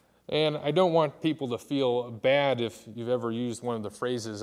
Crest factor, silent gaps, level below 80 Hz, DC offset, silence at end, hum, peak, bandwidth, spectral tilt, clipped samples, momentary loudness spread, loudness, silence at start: 18 dB; none; -72 dBFS; under 0.1%; 0 s; none; -10 dBFS; 14 kHz; -5.5 dB/octave; under 0.1%; 9 LU; -28 LUFS; 0.3 s